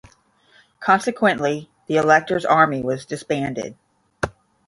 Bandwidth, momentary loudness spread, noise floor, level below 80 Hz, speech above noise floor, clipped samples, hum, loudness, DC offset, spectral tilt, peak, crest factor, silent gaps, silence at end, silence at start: 11.5 kHz; 13 LU; -57 dBFS; -54 dBFS; 37 dB; under 0.1%; none; -20 LUFS; under 0.1%; -5.5 dB/octave; -2 dBFS; 20 dB; none; 0.35 s; 0.8 s